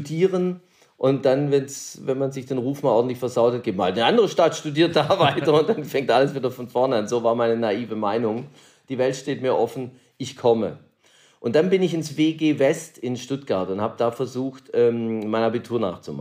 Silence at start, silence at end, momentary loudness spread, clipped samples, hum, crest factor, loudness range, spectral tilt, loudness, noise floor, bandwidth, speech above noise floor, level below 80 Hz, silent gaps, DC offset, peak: 0 s; 0 s; 10 LU; under 0.1%; none; 18 dB; 5 LU; -5.5 dB/octave; -22 LUFS; -57 dBFS; 15.5 kHz; 35 dB; -70 dBFS; none; under 0.1%; -4 dBFS